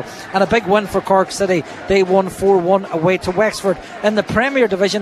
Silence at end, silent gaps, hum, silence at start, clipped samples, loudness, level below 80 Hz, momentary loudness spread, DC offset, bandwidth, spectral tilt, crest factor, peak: 0 s; none; none; 0 s; under 0.1%; -16 LUFS; -44 dBFS; 5 LU; under 0.1%; 14 kHz; -5 dB/octave; 16 dB; 0 dBFS